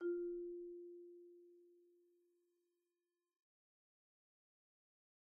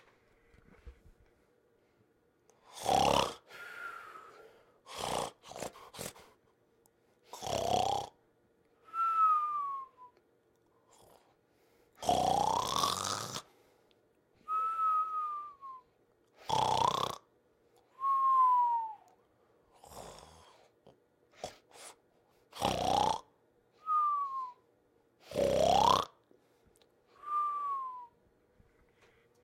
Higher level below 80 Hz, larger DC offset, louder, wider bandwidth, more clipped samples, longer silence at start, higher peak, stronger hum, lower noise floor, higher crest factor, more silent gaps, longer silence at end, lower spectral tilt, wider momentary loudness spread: second, -86 dBFS vs -62 dBFS; neither; second, -49 LUFS vs -33 LUFS; second, 1.8 kHz vs 16.5 kHz; neither; second, 0 s vs 0.85 s; second, -36 dBFS vs -12 dBFS; neither; first, under -90 dBFS vs -71 dBFS; second, 18 dB vs 24 dB; neither; first, 3.35 s vs 1.35 s; second, 3 dB/octave vs -3 dB/octave; about the same, 22 LU vs 23 LU